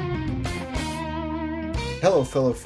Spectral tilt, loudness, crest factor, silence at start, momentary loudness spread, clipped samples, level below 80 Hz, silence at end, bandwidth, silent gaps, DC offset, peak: -6 dB/octave; -26 LUFS; 20 dB; 0 s; 8 LU; under 0.1%; -36 dBFS; 0 s; 11 kHz; none; under 0.1%; -6 dBFS